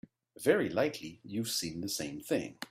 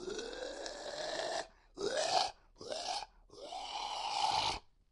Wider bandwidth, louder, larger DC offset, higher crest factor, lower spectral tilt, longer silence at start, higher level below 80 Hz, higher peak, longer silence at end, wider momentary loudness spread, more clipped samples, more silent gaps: first, 16 kHz vs 11.5 kHz; first, -33 LUFS vs -38 LUFS; neither; about the same, 22 dB vs 22 dB; first, -4 dB/octave vs -1.5 dB/octave; first, 0.4 s vs 0 s; about the same, -68 dBFS vs -64 dBFS; first, -12 dBFS vs -16 dBFS; second, 0.05 s vs 0.3 s; second, 9 LU vs 13 LU; neither; neither